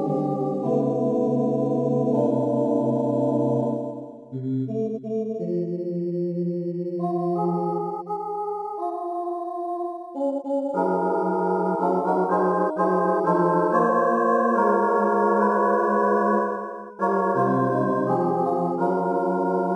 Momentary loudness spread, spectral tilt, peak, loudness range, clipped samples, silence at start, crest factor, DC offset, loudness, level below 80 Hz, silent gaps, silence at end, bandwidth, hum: 9 LU; -9.5 dB/octave; -8 dBFS; 7 LU; under 0.1%; 0 s; 14 dB; under 0.1%; -23 LUFS; -82 dBFS; none; 0 s; 11 kHz; none